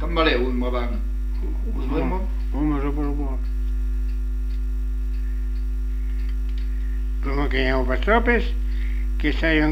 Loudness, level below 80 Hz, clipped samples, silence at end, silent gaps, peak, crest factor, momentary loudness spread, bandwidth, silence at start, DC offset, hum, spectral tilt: -25 LUFS; -24 dBFS; under 0.1%; 0 s; none; -4 dBFS; 18 dB; 8 LU; 5.6 kHz; 0 s; under 0.1%; 50 Hz at -25 dBFS; -7.5 dB/octave